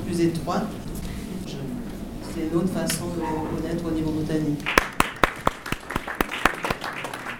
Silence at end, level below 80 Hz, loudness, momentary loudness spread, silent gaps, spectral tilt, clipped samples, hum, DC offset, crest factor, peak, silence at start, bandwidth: 0 s; -40 dBFS; -26 LUFS; 11 LU; none; -5 dB/octave; under 0.1%; none; under 0.1%; 26 dB; 0 dBFS; 0 s; over 20 kHz